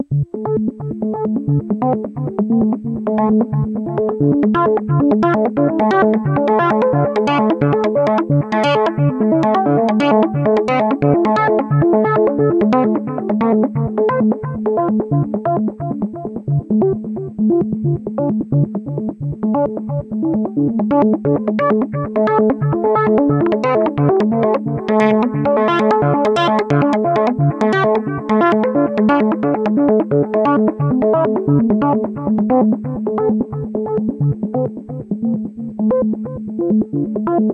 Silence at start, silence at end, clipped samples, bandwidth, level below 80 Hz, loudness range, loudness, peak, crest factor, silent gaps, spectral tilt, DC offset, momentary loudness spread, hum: 0 s; 0 s; under 0.1%; 7.6 kHz; -48 dBFS; 4 LU; -16 LUFS; 0 dBFS; 14 dB; none; -9 dB/octave; under 0.1%; 7 LU; none